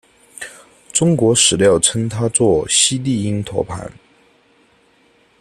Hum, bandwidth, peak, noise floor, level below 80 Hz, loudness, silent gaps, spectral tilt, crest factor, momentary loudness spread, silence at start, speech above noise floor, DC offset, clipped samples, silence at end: none; 13.5 kHz; 0 dBFS; -55 dBFS; -48 dBFS; -15 LUFS; none; -3.5 dB/octave; 18 dB; 21 LU; 0.4 s; 39 dB; under 0.1%; under 0.1%; 1.5 s